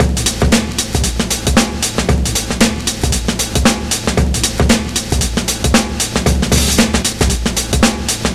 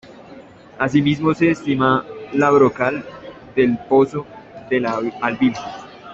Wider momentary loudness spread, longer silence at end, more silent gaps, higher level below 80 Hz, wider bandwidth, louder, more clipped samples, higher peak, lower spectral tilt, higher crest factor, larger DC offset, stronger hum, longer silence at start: second, 4 LU vs 17 LU; about the same, 0 s vs 0 s; neither; first, -20 dBFS vs -54 dBFS; first, 16 kHz vs 7.8 kHz; first, -14 LUFS vs -18 LUFS; neither; about the same, 0 dBFS vs -2 dBFS; second, -3.5 dB/octave vs -7 dB/octave; about the same, 14 dB vs 16 dB; first, 0.9% vs under 0.1%; neither; about the same, 0 s vs 0.05 s